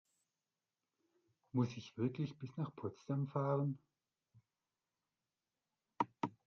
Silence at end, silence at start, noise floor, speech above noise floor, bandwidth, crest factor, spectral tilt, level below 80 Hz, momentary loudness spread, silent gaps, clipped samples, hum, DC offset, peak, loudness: 0.15 s; 1.55 s; under -90 dBFS; over 50 dB; 7 kHz; 24 dB; -8.5 dB/octave; -82 dBFS; 8 LU; none; under 0.1%; none; under 0.1%; -20 dBFS; -41 LUFS